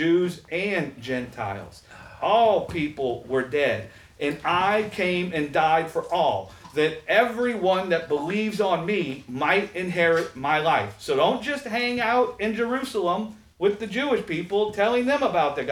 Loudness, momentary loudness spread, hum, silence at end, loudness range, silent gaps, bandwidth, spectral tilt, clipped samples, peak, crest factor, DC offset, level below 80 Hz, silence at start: -24 LUFS; 8 LU; none; 0 s; 2 LU; none; 16 kHz; -5.5 dB/octave; under 0.1%; -6 dBFS; 18 dB; under 0.1%; -58 dBFS; 0 s